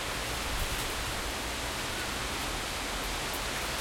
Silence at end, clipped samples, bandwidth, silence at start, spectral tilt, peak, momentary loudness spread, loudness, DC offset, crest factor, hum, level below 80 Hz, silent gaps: 0 s; under 0.1%; 16.5 kHz; 0 s; -2.5 dB/octave; -20 dBFS; 1 LU; -33 LUFS; under 0.1%; 14 dB; none; -42 dBFS; none